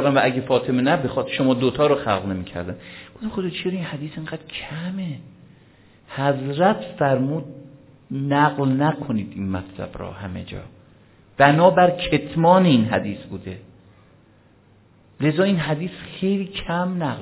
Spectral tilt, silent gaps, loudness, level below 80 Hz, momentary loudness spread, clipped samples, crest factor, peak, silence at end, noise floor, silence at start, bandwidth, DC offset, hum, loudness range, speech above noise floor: -11 dB/octave; none; -21 LUFS; -50 dBFS; 17 LU; under 0.1%; 22 dB; 0 dBFS; 0 s; -54 dBFS; 0 s; 4 kHz; under 0.1%; none; 10 LU; 33 dB